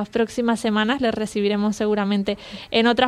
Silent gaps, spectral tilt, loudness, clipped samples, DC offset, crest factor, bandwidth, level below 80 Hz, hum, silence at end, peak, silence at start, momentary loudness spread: none; -5 dB/octave; -22 LUFS; under 0.1%; under 0.1%; 18 dB; 13 kHz; -52 dBFS; none; 0 s; -2 dBFS; 0 s; 4 LU